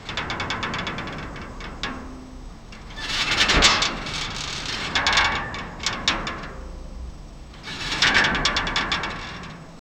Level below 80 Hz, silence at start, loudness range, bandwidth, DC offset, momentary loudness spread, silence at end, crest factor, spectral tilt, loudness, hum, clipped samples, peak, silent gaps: -38 dBFS; 0 s; 4 LU; 17.5 kHz; under 0.1%; 22 LU; 0.2 s; 24 dB; -2 dB/octave; -22 LUFS; none; under 0.1%; -2 dBFS; none